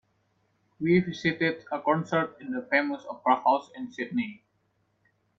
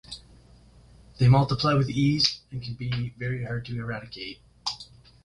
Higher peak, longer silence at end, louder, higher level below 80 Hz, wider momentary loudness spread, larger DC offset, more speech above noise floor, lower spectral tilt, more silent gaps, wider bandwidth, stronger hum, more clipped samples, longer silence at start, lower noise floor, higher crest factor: second, -8 dBFS vs -4 dBFS; first, 1 s vs 0.4 s; about the same, -27 LUFS vs -26 LUFS; second, -68 dBFS vs -50 dBFS; second, 10 LU vs 18 LU; neither; first, 45 dB vs 28 dB; about the same, -7 dB/octave vs -6 dB/octave; neither; second, 7.6 kHz vs 11 kHz; neither; neither; first, 0.8 s vs 0.1 s; first, -72 dBFS vs -53 dBFS; about the same, 20 dB vs 22 dB